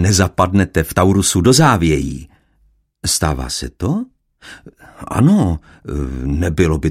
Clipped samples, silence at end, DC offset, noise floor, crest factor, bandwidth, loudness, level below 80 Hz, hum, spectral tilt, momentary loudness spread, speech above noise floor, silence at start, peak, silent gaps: under 0.1%; 0 s; under 0.1%; -57 dBFS; 16 dB; 16 kHz; -16 LUFS; -30 dBFS; none; -5 dB/octave; 14 LU; 42 dB; 0 s; 0 dBFS; none